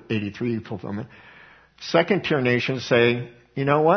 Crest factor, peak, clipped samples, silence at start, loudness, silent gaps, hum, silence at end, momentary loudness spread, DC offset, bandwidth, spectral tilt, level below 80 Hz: 22 dB; -2 dBFS; under 0.1%; 0.1 s; -23 LUFS; none; none; 0 s; 15 LU; under 0.1%; 6.4 kHz; -6.5 dB/octave; -60 dBFS